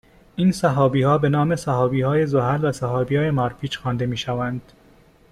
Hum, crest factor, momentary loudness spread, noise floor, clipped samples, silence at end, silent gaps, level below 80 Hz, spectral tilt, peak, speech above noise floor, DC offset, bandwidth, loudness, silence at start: none; 16 dB; 8 LU; -52 dBFS; under 0.1%; 0.7 s; none; -50 dBFS; -7 dB/octave; -6 dBFS; 32 dB; under 0.1%; 13 kHz; -21 LUFS; 0.35 s